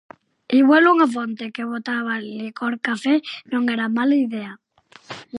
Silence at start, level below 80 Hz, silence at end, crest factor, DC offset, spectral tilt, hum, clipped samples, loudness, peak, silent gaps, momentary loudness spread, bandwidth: 0.5 s; -76 dBFS; 0 s; 16 dB; under 0.1%; -5 dB/octave; none; under 0.1%; -20 LUFS; -4 dBFS; none; 16 LU; 11 kHz